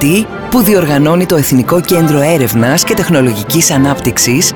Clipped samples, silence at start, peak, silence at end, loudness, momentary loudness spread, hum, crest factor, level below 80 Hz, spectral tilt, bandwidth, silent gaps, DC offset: under 0.1%; 0 s; 0 dBFS; 0 s; -10 LUFS; 3 LU; none; 10 dB; -38 dBFS; -4.5 dB/octave; over 20 kHz; none; under 0.1%